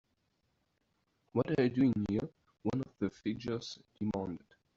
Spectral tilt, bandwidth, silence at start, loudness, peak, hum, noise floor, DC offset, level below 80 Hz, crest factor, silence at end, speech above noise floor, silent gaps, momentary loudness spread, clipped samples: -7 dB/octave; 7.6 kHz; 1.35 s; -35 LUFS; -16 dBFS; none; -79 dBFS; under 0.1%; -64 dBFS; 20 dB; 0.4 s; 45 dB; none; 12 LU; under 0.1%